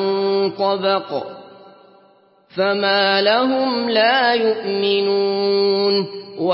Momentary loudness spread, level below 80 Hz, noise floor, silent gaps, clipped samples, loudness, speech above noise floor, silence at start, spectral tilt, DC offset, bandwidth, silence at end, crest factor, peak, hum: 9 LU; -74 dBFS; -53 dBFS; none; under 0.1%; -17 LUFS; 36 dB; 0 s; -9 dB/octave; under 0.1%; 5.8 kHz; 0 s; 16 dB; -2 dBFS; none